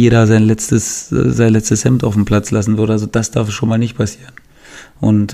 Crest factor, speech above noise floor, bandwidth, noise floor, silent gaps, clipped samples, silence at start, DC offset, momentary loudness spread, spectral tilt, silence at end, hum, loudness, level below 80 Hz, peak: 12 dB; 26 dB; 14.5 kHz; -38 dBFS; none; under 0.1%; 0 s; under 0.1%; 7 LU; -6 dB/octave; 0 s; none; -14 LUFS; -36 dBFS; 0 dBFS